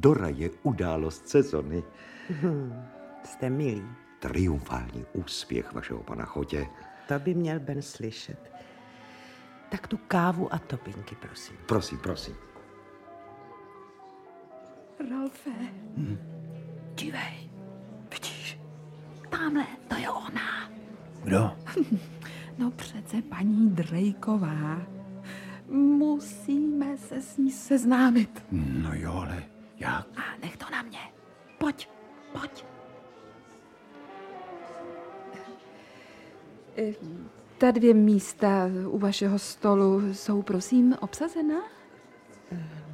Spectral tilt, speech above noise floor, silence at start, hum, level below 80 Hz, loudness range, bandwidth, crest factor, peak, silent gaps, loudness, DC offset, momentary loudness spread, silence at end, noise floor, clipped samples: -6.5 dB/octave; 25 dB; 0 s; none; -52 dBFS; 15 LU; 15 kHz; 22 dB; -6 dBFS; none; -28 LUFS; under 0.1%; 24 LU; 0 s; -53 dBFS; under 0.1%